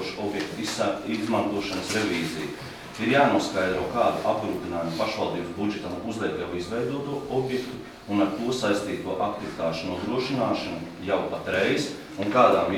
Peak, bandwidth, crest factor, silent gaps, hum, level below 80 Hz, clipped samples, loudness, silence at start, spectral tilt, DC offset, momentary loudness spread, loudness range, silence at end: -6 dBFS; 17.5 kHz; 20 dB; none; none; -56 dBFS; under 0.1%; -27 LUFS; 0 s; -5 dB/octave; under 0.1%; 9 LU; 4 LU; 0 s